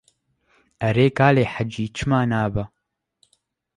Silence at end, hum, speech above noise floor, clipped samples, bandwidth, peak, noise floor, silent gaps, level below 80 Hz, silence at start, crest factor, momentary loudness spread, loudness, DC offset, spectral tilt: 1.1 s; none; 48 dB; under 0.1%; 11 kHz; -4 dBFS; -68 dBFS; none; -48 dBFS; 0.8 s; 20 dB; 10 LU; -21 LUFS; under 0.1%; -7 dB/octave